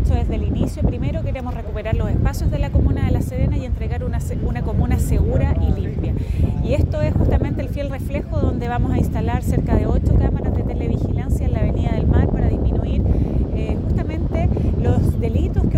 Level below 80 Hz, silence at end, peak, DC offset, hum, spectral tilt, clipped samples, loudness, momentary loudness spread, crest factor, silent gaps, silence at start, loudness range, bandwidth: -22 dBFS; 0 s; -4 dBFS; under 0.1%; none; -8.5 dB/octave; under 0.1%; -20 LUFS; 6 LU; 14 dB; none; 0 s; 2 LU; 13.5 kHz